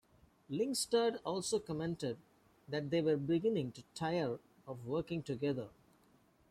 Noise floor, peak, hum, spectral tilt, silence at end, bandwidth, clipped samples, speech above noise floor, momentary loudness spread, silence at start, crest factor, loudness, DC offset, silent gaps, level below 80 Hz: -69 dBFS; -20 dBFS; none; -5 dB/octave; 0.8 s; 15 kHz; under 0.1%; 33 dB; 11 LU; 0.5 s; 18 dB; -37 LUFS; under 0.1%; none; -70 dBFS